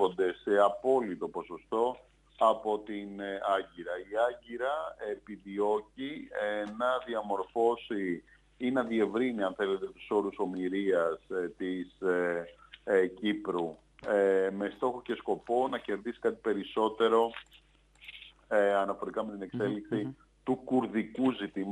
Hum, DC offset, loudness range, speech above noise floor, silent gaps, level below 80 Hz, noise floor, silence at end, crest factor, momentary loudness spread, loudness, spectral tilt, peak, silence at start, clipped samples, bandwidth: none; under 0.1%; 3 LU; 23 dB; none; -66 dBFS; -54 dBFS; 0 s; 20 dB; 12 LU; -32 LUFS; -6.5 dB/octave; -12 dBFS; 0 s; under 0.1%; 10.5 kHz